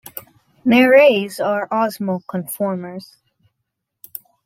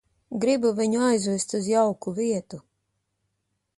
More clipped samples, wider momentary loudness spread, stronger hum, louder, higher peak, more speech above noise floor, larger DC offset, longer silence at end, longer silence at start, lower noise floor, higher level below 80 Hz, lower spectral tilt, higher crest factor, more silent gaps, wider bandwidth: neither; first, 24 LU vs 11 LU; neither; first, -17 LUFS vs -24 LUFS; first, -2 dBFS vs -10 dBFS; first, 61 dB vs 53 dB; neither; first, 1.45 s vs 1.2 s; second, 0.15 s vs 0.3 s; about the same, -77 dBFS vs -77 dBFS; about the same, -66 dBFS vs -68 dBFS; about the same, -5.5 dB/octave vs -5 dB/octave; about the same, 18 dB vs 16 dB; neither; first, 16.5 kHz vs 11.5 kHz